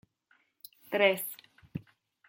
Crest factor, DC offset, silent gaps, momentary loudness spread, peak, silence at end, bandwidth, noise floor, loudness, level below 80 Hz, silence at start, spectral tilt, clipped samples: 24 dB; under 0.1%; none; 26 LU; -10 dBFS; 0.5 s; 16.5 kHz; -71 dBFS; -29 LUFS; -74 dBFS; 0.9 s; -3.5 dB/octave; under 0.1%